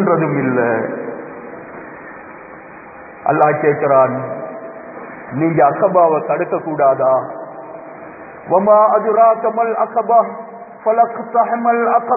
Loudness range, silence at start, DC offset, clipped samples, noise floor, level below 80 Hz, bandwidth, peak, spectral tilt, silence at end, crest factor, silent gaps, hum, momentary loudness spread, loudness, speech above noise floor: 6 LU; 0 s; under 0.1%; under 0.1%; -36 dBFS; -62 dBFS; 2.7 kHz; 0 dBFS; -13.5 dB/octave; 0 s; 16 dB; none; none; 21 LU; -15 LUFS; 22 dB